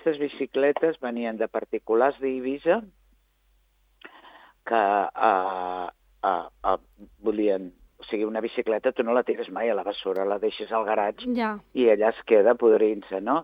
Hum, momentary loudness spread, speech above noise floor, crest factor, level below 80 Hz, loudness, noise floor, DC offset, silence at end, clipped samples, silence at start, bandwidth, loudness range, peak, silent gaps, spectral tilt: none; 10 LU; 41 dB; 20 dB; -62 dBFS; -25 LUFS; -65 dBFS; under 0.1%; 0 s; under 0.1%; 0.05 s; 5 kHz; 5 LU; -6 dBFS; none; -7.5 dB/octave